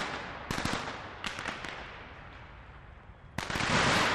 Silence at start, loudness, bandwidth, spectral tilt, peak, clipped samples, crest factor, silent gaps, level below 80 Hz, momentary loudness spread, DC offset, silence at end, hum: 0 s; -33 LUFS; 15 kHz; -3.5 dB/octave; -14 dBFS; under 0.1%; 20 dB; none; -52 dBFS; 24 LU; under 0.1%; 0 s; none